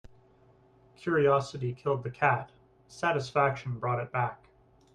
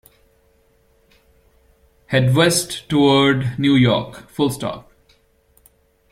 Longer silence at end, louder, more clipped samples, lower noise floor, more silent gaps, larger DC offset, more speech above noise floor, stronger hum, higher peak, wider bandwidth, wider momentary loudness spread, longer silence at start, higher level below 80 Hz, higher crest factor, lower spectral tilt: second, 0.6 s vs 1.3 s; second, -30 LUFS vs -17 LUFS; neither; about the same, -61 dBFS vs -58 dBFS; neither; neither; second, 32 dB vs 41 dB; neither; second, -10 dBFS vs -2 dBFS; second, 10.5 kHz vs 16 kHz; second, 9 LU vs 13 LU; second, 0.05 s vs 2.1 s; second, -64 dBFS vs -52 dBFS; about the same, 20 dB vs 18 dB; first, -6.5 dB/octave vs -5 dB/octave